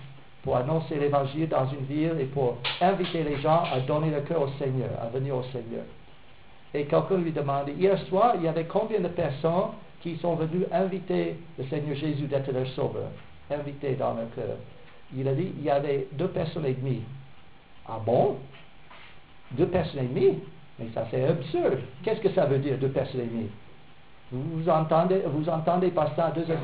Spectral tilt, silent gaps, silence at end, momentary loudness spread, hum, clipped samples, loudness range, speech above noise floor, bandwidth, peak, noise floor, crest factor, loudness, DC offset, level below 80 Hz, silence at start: -11 dB/octave; none; 0 s; 12 LU; none; under 0.1%; 4 LU; 27 dB; 4 kHz; -10 dBFS; -54 dBFS; 18 dB; -28 LUFS; 0.4%; -56 dBFS; 0 s